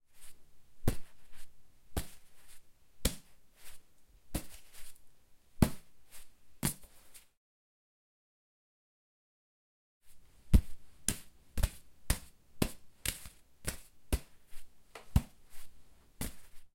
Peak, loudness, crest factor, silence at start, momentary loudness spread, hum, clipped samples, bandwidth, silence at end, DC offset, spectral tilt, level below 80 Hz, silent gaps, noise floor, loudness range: -8 dBFS; -38 LUFS; 30 dB; 0.1 s; 25 LU; none; under 0.1%; 16.5 kHz; 0.05 s; under 0.1%; -4.5 dB/octave; -42 dBFS; 7.37-10.00 s; -59 dBFS; 8 LU